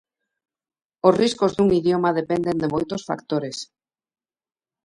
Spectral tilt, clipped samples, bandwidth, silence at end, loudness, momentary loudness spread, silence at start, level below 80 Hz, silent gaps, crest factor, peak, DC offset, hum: -6 dB/octave; under 0.1%; 11 kHz; 1.2 s; -21 LUFS; 11 LU; 1.05 s; -56 dBFS; none; 20 dB; -2 dBFS; under 0.1%; none